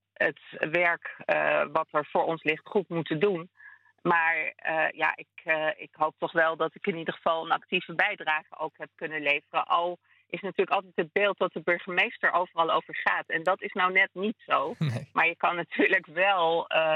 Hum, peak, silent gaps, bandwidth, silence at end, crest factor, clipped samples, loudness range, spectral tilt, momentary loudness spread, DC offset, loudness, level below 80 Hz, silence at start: none; -8 dBFS; none; 10.5 kHz; 0 s; 20 dB; under 0.1%; 3 LU; -6.5 dB/octave; 8 LU; under 0.1%; -27 LUFS; -80 dBFS; 0.2 s